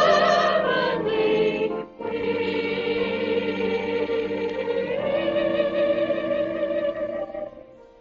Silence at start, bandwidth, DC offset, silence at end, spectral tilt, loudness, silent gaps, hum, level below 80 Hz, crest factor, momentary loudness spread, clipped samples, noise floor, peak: 0 s; 7 kHz; under 0.1%; 0.2 s; -3 dB/octave; -24 LUFS; none; none; -56 dBFS; 18 dB; 8 LU; under 0.1%; -46 dBFS; -6 dBFS